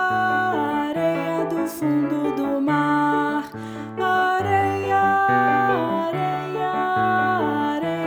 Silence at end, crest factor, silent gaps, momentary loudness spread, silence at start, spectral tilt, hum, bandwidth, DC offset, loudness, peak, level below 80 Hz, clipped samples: 0 s; 14 dB; none; 7 LU; 0 s; -6.5 dB/octave; none; over 20 kHz; under 0.1%; -21 LUFS; -8 dBFS; -62 dBFS; under 0.1%